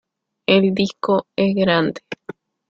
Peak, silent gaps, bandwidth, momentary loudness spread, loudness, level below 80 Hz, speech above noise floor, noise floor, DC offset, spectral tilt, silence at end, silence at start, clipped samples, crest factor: -2 dBFS; none; 7.4 kHz; 18 LU; -18 LUFS; -56 dBFS; 22 dB; -39 dBFS; under 0.1%; -6.5 dB/octave; 0.55 s; 0.5 s; under 0.1%; 18 dB